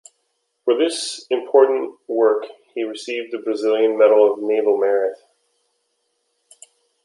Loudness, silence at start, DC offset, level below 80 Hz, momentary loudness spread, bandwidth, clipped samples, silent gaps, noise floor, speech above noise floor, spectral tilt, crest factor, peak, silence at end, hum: -19 LUFS; 0.65 s; under 0.1%; -80 dBFS; 12 LU; 11.5 kHz; under 0.1%; none; -71 dBFS; 53 dB; -2.5 dB/octave; 18 dB; -2 dBFS; 1.9 s; none